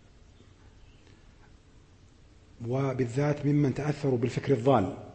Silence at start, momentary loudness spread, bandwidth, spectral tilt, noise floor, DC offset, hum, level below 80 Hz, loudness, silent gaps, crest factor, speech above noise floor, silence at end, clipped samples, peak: 0.65 s; 6 LU; 8.6 kHz; -8 dB/octave; -56 dBFS; under 0.1%; none; -58 dBFS; -28 LUFS; none; 20 dB; 29 dB; 0 s; under 0.1%; -12 dBFS